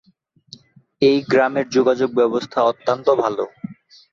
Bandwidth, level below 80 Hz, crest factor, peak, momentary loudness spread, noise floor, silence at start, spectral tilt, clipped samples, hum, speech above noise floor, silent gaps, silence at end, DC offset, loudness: 7.2 kHz; -62 dBFS; 16 dB; -4 dBFS; 10 LU; -57 dBFS; 1 s; -5.5 dB/octave; under 0.1%; none; 40 dB; none; 0.4 s; under 0.1%; -18 LUFS